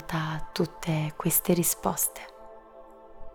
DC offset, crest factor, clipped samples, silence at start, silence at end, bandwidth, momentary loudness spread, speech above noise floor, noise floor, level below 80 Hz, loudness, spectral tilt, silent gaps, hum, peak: under 0.1%; 20 dB; under 0.1%; 0 s; 0 s; over 20 kHz; 9 LU; 21 dB; -49 dBFS; -50 dBFS; -27 LUFS; -4.5 dB/octave; none; none; -10 dBFS